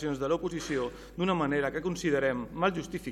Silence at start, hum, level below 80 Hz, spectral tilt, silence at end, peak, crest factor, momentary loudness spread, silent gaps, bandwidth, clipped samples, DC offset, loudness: 0 s; none; -52 dBFS; -5.5 dB/octave; 0 s; -14 dBFS; 18 dB; 5 LU; none; 16 kHz; under 0.1%; under 0.1%; -31 LUFS